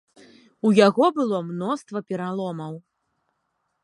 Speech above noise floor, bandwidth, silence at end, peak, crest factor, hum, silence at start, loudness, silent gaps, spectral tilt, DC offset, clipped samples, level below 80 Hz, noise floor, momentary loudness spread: 53 dB; 11 kHz; 1.05 s; -2 dBFS; 22 dB; none; 0.65 s; -22 LUFS; none; -6.5 dB/octave; under 0.1%; under 0.1%; -76 dBFS; -75 dBFS; 16 LU